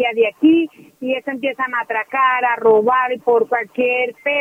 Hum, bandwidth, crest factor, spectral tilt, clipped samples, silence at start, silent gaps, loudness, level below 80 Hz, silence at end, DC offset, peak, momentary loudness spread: none; 3.6 kHz; 14 dB; -6 dB/octave; under 0.1%; 0 s; none; -17 LUFS; -66 dBFS; 0 s; under 0.1%; -2 dBFS; 9 LU